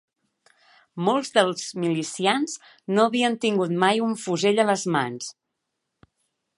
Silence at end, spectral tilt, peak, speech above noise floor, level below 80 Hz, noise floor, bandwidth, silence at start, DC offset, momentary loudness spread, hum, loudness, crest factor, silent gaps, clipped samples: 1.25 s; -4.5 dB/octave; -4 dBFS; 57 dB; -74 dBFS; -80 dBFS; 11.5 kHz; 0.95 s; under 0.1%; 10 LU; none; -23 LUFS; 20 dB; none; under 0.1%